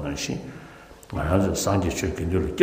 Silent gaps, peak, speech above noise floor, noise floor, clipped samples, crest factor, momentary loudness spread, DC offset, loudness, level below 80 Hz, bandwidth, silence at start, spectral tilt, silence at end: none; -4 dBFS; 22 dB; -45 dBFS; under 0.1%; 22 dB; 20 LU; under 0.1%; -25 LUFS; -38 dBFS; 15.5 kHz; 0 s; -5.5 dB/octave; 0 s